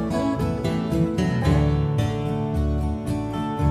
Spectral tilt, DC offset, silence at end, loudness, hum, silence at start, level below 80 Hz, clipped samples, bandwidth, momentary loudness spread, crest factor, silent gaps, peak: -8 dB/octave; under 0.1%; 0 s; -24 LUFS; none; 0 s; -32 dBFS; under 0.1%; 14 kHz; 6 LU; 14 dB; none; -8 dBFS